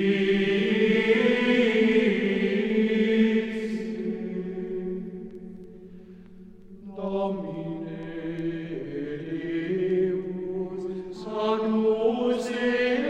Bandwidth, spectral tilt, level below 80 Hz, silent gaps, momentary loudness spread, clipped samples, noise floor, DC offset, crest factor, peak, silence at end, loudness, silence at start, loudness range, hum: 9.2 kHz; -6.5 dB/octave; -56 dBFS; none; 14 LU; under 0.1%; -46 dBFS; under 0.1%; 16 dB; -10 dBFS; 0 s; -26 LUFS; 0 s; 12 LU; none